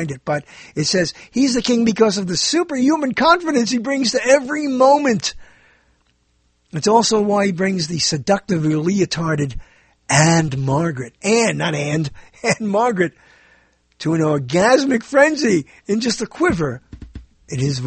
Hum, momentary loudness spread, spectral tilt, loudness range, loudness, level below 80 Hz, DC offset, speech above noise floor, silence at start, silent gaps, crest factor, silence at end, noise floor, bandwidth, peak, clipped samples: none; 9 LU; -4.5 dB/octave; 3 LU; -17 LUFS; -46 dBFS; under 0.1%; 45 dB; 0 s; none; 18 dB; 0 s; -62 dBFS; 8.8 kHz; 0 dBFS; under 0.1%